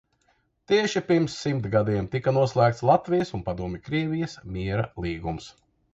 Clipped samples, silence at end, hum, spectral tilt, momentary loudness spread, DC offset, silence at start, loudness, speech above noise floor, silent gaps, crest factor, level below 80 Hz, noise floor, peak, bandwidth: under 0.1%; 0.45 s; none; -6.5 dB/octave; 11 LU; under 0.1%; 0.7 s; -25 LUFS; 44 dB; none; 20 dB; -48 dBFS; -68 dBFS; -6 dBFS; 8 kHz